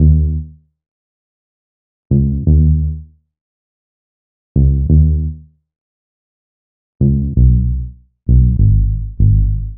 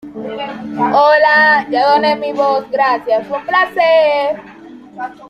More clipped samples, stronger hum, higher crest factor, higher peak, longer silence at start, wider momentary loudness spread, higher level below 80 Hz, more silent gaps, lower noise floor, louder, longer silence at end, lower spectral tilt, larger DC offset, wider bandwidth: neither; neither; about the same, 14 dB vs 12 dB; about the same, 0 dBFS vs -2 dBFS; about the same, 0 s vs 0.05 s; about the same, 13 LU vs 15 LU; first, -18 dBFS vs -58 dBFS; first, 0.88-2.10 s, 3.41-4.55 s, 5.78-6.99 s vs none; first, under -90 dBFS vs -36 dBFS; about the same, -14 LUFS vs -12 LUFS; about the same, 0 s vs 0.05 s; first, -21.5 dB/octave vs -5 dB/octave; neither; second, 0.8 kHz vs 12 kHz